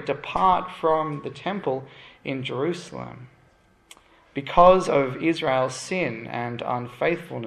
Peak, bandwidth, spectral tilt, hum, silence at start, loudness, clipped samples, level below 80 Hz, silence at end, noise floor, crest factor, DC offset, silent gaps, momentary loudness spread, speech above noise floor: -2 dBFS; 12 kHz; -5.5 dB/octave; none; 0 s; -24 LUFS; under 0.1%; -50 dBFS; 0 s; -59 dBFS; 22 dB; under 0.1%; none; 17 LU; 35 dB